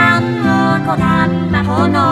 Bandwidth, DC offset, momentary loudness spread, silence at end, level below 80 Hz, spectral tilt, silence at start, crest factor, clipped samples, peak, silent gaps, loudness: 12.5 kHz; under 0.1%; 2 LU; 0 s; -36 dBFS; -7 dB/octave; 0 s; 12 dB; under 0.1%; 0 dBFS; none; -13 LUFS